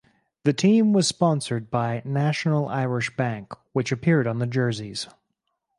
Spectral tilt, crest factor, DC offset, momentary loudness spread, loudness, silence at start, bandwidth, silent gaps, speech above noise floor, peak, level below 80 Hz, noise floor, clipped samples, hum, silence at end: -6 dB/octave; 18 dB; under 0.1%; 11 LU; -24 LUFS; 0.45 s; 11.5 kHz; none; 55 dB; -6 dBFS; -62 dBFS; -77 dBFS; under 0.1%; none; 0.7 s